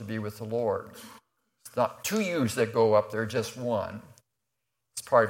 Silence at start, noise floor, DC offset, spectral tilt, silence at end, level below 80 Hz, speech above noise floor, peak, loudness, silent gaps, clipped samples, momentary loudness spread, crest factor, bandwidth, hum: 0 s; -84 dBFS; under 0.1%; -5 dB/octave; 0 s; -68 dBFS; 55 dB; -8 dBFS; -29 LUFS; none; under 0.1%; 18 LU; 20 dB; 16.5 kHz; none